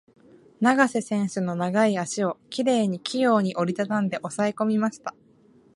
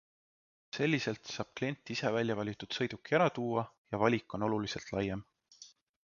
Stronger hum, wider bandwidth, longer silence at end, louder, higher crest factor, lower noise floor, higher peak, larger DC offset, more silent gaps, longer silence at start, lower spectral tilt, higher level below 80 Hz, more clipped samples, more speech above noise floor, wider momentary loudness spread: neither; first, 11.5 kHz vs 7.2 kHz; first, 0.65 s vs 0.35 s; first, -24 LUFS vs -34 LUFS; about the same, 20 dB vs 22 dB; about the same, -57 dBFS vs -59 dBFS; first, -4 dBFS vs -14 dBFS; neither; second, none vs 3.78-3.85 s; second, 0.6 s vs 0.75 s; about the same, -5.5 dB/octave vs -4.5 dB/octave; second, -72 dBFS vs -64 dBFS; neither; first, 33 dB vs 25 dB; second, 6 LU vs 10 LU